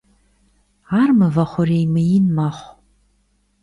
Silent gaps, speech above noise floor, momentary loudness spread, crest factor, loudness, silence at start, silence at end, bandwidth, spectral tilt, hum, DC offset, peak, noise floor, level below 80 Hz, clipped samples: none; 46 dB; 8 LU; 14 dB; -17 LUFS; 0.9 s; 0.95 s; 10.5 kHz; -9 dB/octave; 50 Hz at -40 dBFS; under 0.1%; -4 dBFS; -62 dBFS; -52 dBFS; under 0.1%